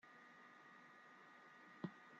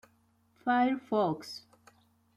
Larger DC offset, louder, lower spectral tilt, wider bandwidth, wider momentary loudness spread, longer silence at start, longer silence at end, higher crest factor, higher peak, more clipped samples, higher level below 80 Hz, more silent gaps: neither; second, -60 LUFS vs -31 LUFS; about the same, -5 dB/octave vs -6 dB/octave; second, 7.6 kHz vs 13 kHz; second, 9 LU vs 16 LU; second, 0.05 s vs 0.65 s; second, 0 s vs 0.8 s; first, 24 dB vs 18 dB; second, -36 dBFS vs -16 dBFS; neither; second, under -90 dBFS vs -74 dBFS; neither